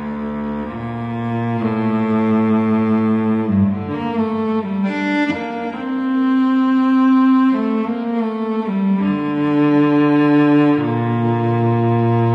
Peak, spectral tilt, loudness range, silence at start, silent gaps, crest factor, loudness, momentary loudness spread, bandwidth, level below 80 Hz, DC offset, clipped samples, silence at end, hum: -4 dBFS; -9.5 dB/octave; 3 LU; 0 s; none; 12 dB; -17 LUFS; 10 LU; 6.2 kHz; -52 dBFS; under 0.1%; under 0.1%; 0 s; none